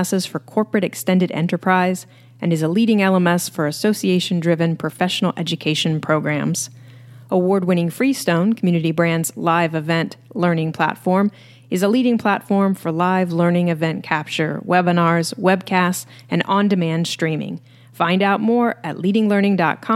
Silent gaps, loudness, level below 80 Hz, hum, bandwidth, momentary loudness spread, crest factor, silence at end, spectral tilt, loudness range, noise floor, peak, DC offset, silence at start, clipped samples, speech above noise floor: none; -19 LUFS; -70 dBFS; none; 15.5 kHz; 6 LU; 18 dB; 0 s; -5.5 dB/octave; 1 LU; -41 dBFS; 0 dBFS; under 0.1%; 0 s; under 0.1%; 23 dB